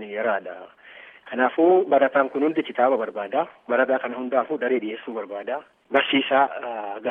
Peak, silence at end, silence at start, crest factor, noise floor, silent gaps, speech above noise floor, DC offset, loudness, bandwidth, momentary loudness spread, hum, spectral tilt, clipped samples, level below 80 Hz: -4 dBFS; 0 s; 0 s; 20 dB; -46 dBFS; none; 24 dB; under 0.1%; -23 LUFS; 3.8 kHz; 13 LU; none; -7 dB/octave; under 0.1%; -80 dBFS